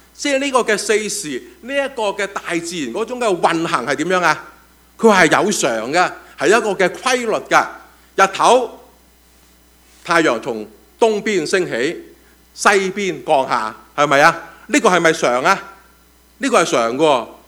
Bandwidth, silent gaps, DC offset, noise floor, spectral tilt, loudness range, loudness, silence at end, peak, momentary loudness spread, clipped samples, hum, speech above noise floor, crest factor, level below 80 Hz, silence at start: over 20 kHz; none; under 0.1%; -50 dBFS; -3 dB/octave; 4 LU; -16 LUFS; 0.15 s; 0 dBFS; 11 LU; under 0.1%; none; 34 dB; 18 dB; -56 dBFS; 0.2 s